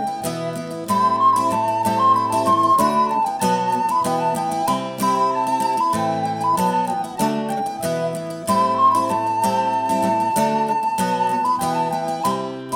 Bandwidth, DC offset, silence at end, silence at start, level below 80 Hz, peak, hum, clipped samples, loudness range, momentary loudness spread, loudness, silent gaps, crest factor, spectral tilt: 19.5 kHz; under 0.1%; 0 s; 0 s; -60 dBFS; -6 dBFS; none; under 0.1%; 3 LU; 8 LU; -19 LUFS; none; 14 dB; -5 dB/octave